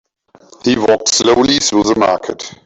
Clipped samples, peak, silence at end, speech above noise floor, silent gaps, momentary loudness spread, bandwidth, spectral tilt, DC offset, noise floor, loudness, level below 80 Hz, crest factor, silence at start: under 0.1%; 0 dBFS; 0.1 s; 33 dB; none; 9 LU; 8.4 kHz; -3 dB/octave; under 0.1%; -46 dBFS; -12 LUFS; -46 dBFS; 14 dB; 0.65 s